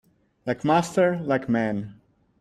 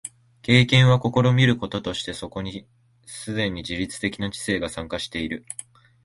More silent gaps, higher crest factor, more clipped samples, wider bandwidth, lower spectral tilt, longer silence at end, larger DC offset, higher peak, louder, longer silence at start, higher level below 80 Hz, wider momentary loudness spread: neither; about the same, 18 dB vs 22 dB; neither; first, 14 kHz vs 11.5 kHz; about the same, -6.5 dB/octave vs -5.5 dB/octave; about the same, 0.5 s vs 0.5 s; neither; second, -8 dBFS vs -2 dBFS; about the same, -24 LUFS vs -22 LUFS; first, 0.45 s vs 0.05 s; second, -60 dBFS vs -48 dBFS; second, 12 LU vs 19 LU